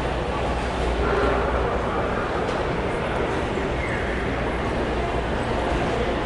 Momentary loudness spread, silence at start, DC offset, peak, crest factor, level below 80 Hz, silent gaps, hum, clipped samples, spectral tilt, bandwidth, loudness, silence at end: 3 LU; 0 s; under 0.1%; -10 dBFS; 14 dB; -30 dBFS; none; none; under 0.1%; -6 dB/octave; 11 kHz; -24 LUFS; 0 s